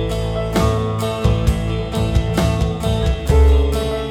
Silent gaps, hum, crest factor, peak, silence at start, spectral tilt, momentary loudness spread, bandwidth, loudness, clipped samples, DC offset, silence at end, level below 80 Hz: none; none; 14 dB; -2 dBFS; 0 s; -6.5 dB/octave; 7 LU; 15.5 kHz; -18 LUFS; under 0.1%; under 0.1%; 0 s; -20 dBFS